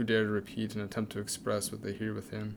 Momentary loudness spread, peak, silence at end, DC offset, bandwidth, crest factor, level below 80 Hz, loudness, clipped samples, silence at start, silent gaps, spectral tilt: 7 LU; -16 dBFS; 0 s; under 0.1%; 19.5 kHz; 18 dB; -64 dBFS; -35 LUFS; under 0.1%; 0 s; none; -4.5 dB/octave